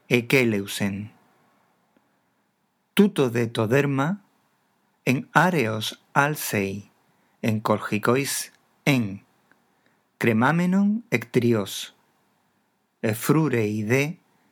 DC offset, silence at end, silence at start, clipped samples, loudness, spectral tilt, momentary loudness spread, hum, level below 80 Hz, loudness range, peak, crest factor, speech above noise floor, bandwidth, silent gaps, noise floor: under 0.1%; 0.35 s; 0.1 s; under 0.1%; -23 LUFS; -5.5 dB/octave; 11 LU; none; -76 dBFS; 2 LU; 0 dBFS; 24 dB; 48 dB; over 20 kHz; none; -71 dBFS